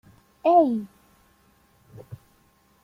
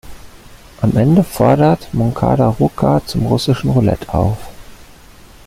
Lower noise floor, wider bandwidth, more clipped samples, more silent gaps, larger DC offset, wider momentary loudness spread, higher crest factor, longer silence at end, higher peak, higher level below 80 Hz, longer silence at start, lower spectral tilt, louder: first, -62 dBFS vs -40 dBFS; second, 14.5 kHz vs 16 kHz; neither; neither; neither; first, 26 LU vs 6 LU; first, 20 dB vs 14 dB; about the same, 0.7 s vs 0.65 s; second, -8 dBFS vs 0 dBFS; second, -66 dBFS vs -34 dBFS; first, 0.45 s vs 0.05 s; about the same, -8 dB/octave vs -7.5 dB/octave; second, -21 LUFS vs -14 LUFS